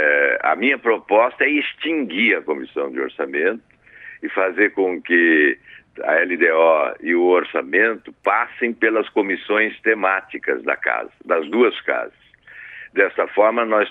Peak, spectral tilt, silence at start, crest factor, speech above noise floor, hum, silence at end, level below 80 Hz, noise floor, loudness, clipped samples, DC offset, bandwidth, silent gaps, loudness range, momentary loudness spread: -2 dBFS; -6.5 dB/octave; 0 s; 18 dB; 23 dB; none; 0 s; -68 dBFS; -42 dBFS; -18 LUFS; under 0.1%; under 0.1%; 4.1 kHz; none; 4 LU; 10 LU